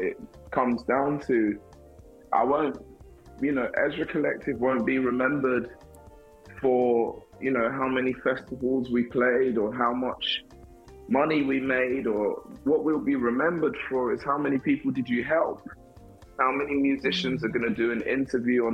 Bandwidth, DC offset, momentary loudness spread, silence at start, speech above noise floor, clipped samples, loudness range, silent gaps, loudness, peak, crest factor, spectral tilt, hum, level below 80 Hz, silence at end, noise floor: 8.6 kHz; under 0.1%; 6 LU; 0 s; 25 dB; under 0.1%; 2 LU; none; -26 LUFS; -8 dBFS; 18 dB; -6.5 dB/octave; none; -56 dBFS; 0 s; -50 dBFS